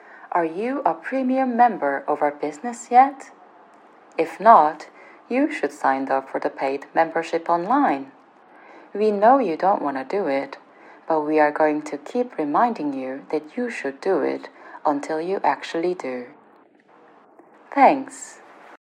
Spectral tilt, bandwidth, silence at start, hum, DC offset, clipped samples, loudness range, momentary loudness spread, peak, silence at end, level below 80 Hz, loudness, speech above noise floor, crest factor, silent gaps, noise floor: -5.5 dB/octave; 10.5 kHz; 0.1 s; none; under 0.1%; under 0.1%; 5 LU; 15 LU; 0 dBFS; 0.1 s; under -90 dBFS; -21 LUFS; 33 dB; 22 dB; none; -53 dBFS